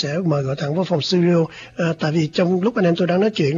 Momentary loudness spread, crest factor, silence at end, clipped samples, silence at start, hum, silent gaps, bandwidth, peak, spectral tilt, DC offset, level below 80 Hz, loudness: 5 LU; 12 dB; 0 s; under 0.1%; 0 s; none; none; 7.4 kHz; -6 dBFS; -7 dB/octave; under 0.1%; -56 dBFS; -19 LUFS